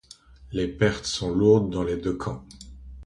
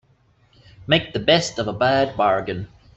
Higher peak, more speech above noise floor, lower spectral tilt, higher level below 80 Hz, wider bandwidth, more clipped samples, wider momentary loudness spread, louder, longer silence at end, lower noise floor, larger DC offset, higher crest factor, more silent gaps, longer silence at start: second, -6 dBFS vs -2 dBFS; second, 26 dB vs 39 dB; first, -6 dB/octave vs -4.5 dB/octave; first, -44 dBFS vs -50 dBFS; first, 11 kHz vs 8.2 kHz; neither; first, 23 LU vs 12 LU; second, -25 LUFS vs -20 LUFS; second, 0 s vs 0.3 s; second, -50 dBFS vs -59 dBFS; neither; about the same, 20 dB vs 20 dB; neither; second, 0.4 s vs 0.8 s